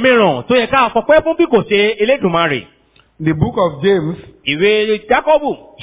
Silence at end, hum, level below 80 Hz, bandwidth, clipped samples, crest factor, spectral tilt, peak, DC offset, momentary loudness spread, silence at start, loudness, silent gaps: 0 s; none; -42 dBFS; 4 kHz; under 0.1%; 14 dB; -9.5 dB/octave; 0 dBFS; under 0.1%; 8 LU; 0 s; -14 LUFS; none